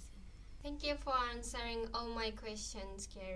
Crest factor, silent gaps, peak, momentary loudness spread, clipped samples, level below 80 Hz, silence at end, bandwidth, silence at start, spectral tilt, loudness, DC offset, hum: 18 dB; none; -24 dBFS; 15 LU; under 0.1%; -50 dBFS; 0 s; 11 kHz; 0 s; -3 dB/octave; -41 LUFS; under 0.1%; none